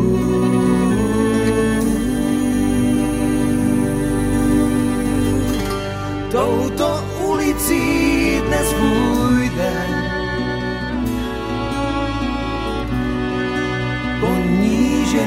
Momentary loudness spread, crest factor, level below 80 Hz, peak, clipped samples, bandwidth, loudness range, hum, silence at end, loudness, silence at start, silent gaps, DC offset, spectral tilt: 6 LU; 14 dB; -30 dBFS; -4 dBFS; under 0.1%; 16 kHz; 4 LU; none; 0 s; -18 LUFS; 0 s; none; under 0.1%; -5.5 dB/octave